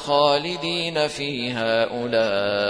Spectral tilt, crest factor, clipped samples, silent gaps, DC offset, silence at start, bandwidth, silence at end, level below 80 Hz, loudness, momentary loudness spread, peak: -4.5 dB/octave; 18 dB; under 0.1%; none; 0.1%; 0 s; 10.5 kHz; 0 s; -60 dBFS; -22 LUFS; 6 LU; -4 dBFS